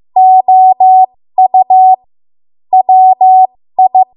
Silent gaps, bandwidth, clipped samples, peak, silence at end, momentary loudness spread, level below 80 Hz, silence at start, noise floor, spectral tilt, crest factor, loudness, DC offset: none; 1 kHz; under 0.1%; 0 dBFS; 0.1 s; 6 LU; -68 dBFS; 0.15 s; under -90 dBFS; -9 dB/octave; 6 dB; -7 LUFS; under 0.1%